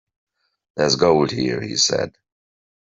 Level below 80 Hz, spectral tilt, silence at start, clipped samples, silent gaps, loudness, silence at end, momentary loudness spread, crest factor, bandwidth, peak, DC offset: -54 dBFS; -3.5 dB/octave; 0.75 s; under 0.1%; none; -19 LUFS; 0.85 s; 11 LU; 20 dB; 7.8 kHz; -2 dBFS; under 0.1%